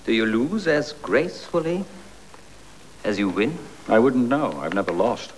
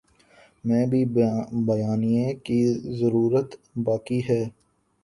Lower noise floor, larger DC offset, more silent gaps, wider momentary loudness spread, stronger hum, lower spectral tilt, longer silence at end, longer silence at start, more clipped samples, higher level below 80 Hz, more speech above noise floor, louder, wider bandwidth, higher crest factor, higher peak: second, -47 dBFS vs -56 dBFS; first, 0.5% vs under 0.1%; neither; first, 9 LU vs 5 LU; neither; second, -6 dB/octave vs -8.5 dB/octave; second, 0.05 s vs 0.55 s; second, 0.05 s vs 0.65 s; neither; first, -54 dBFS vs -60 dBFS; second, 25 dB vs 33 dB; about the same, -23 LUFS vs -24 LUFS; about the same, 11 kHz vs 11.5 kHz; about the same, 18 dB vs 14 dB; first, -6 dBFS vs -10 dBFS